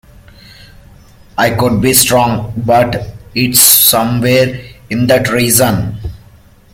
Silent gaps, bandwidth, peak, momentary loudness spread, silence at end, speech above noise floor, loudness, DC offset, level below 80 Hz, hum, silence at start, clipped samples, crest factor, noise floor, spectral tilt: none; over 20 kHz; 0 dBFS; 16 LU; 0.55 s; 31 dB; -10 LUFS; under 0.1%; -36 dBFS; none; 1.35 s; 0.3%; 12 dB; -42 dBFS; -3.5 dB/octave